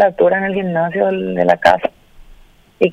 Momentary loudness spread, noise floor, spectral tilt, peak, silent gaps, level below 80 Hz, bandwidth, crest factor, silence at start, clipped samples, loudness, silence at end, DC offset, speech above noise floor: 6 LU; -44 dBFS; -7 dB/octave; 0 dBFS; none; -46 dBFS; 13 kHz; 16 dB; 0 s; under 0.1%; -15 LUFS; 0 s; under 0.1%; 30 dB